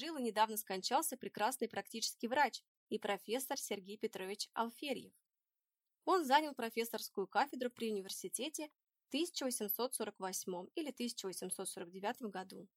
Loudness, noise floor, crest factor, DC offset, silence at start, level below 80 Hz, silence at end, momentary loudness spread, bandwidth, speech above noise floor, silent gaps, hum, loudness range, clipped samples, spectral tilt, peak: -40 LUFS; under -90 dBFS; 22 dB; under 0.1%; 0 s; under -90 dBFS; 0.1 s; 9 LU; 16.5 kHz; over 50 dB; 2.68-2.87 s; none; 3 LU; under 0.1%; -2.5 dB/octave; -18 dBFS